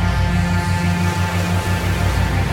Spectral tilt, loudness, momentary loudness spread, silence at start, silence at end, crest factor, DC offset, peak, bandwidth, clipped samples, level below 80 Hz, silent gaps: -5.5 dB/octave; -19 LUFS; 1 LU; 0 s; 0 s; 12 dB; under 0.1%; -6 dBFS; 16.5 kHz; under 0.1%; -26 dBFS; none